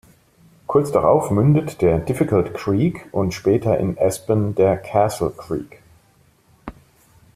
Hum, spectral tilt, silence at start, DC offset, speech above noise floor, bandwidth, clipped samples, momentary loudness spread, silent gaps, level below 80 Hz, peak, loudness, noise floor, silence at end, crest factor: none; -7.5 dB/octave; 0.7 s; under 0.1%; 38 dB; 15 kHz; under 0.1%; 15 LU; none; -46 dBFS; -2 dBFS; -19 LUFS; -56 dBFS; 0.65 s; 18 dB